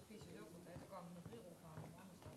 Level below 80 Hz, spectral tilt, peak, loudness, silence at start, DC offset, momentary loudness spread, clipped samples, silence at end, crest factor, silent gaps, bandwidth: -76 dBFS; -5.5 dB/octave; -42 dBFS; -57 LUFS; 0 s; under 0.1%; 3 LU; under 0.1%; 0 s; 14 dB; none; 13 kHz